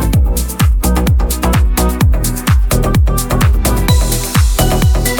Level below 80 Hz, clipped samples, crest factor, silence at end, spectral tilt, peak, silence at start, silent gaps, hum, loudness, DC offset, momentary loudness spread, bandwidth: -14 dBFS; under 0.1%; 10 dB; 0 s; -5 dB/octave; 0 dBFS; 0 s; none; none; -13 LUFS; under 0.1%; 2 LU; 18.5 kHz